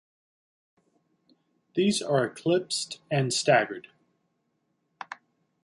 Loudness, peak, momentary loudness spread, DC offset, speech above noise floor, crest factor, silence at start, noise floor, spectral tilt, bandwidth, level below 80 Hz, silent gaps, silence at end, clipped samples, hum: -26 LUFS; -8 dBFS; 20 LU; under 0.1%; 50 dB; 22 dB; 1.75 s; -76 dBFS; -4 dB/octave; 11.5 kHz; -74 dBFS; none; 0.5 s; under 0.1%; none